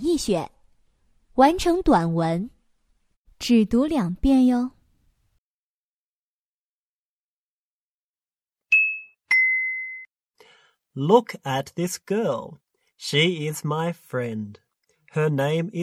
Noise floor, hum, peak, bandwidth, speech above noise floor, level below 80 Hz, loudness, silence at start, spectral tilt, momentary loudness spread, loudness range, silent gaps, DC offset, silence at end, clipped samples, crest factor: under -90 dBFS; none; -4 dBFS; 15.5 kHz; over 68 dB; -46 dBFS; -22 LUFS; 0 s; -5.5 dB/octave; 15 LU; 5 LU; 3.17-3.25 s, 5.38-8.15 s, 8.42-8.46 s; under 0.1%; 0 s; under 0.1%; 22 dB